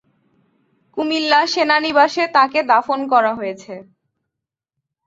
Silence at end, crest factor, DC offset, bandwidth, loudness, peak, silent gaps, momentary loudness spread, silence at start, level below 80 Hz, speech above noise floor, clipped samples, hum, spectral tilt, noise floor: 1.25 s; 18 dB; under 0.1%; 7.8 kHz; -16 LUFS; 0 dBFS; none; 16 LU; 0.95 s; -66 dBFS; 67 dB; under 0.1%; none; -3 dB/octave; -83 dBFS